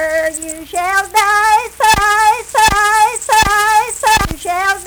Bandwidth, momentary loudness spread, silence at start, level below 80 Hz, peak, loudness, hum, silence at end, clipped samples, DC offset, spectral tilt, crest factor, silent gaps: over 20 kHz; 8 LU; 0 s; -32 dBFS; 0 dBFS; -12 LUFS; none; 0 s; under 0.1%; under 0.1%; -1.5 dB/octave; 12 dB; none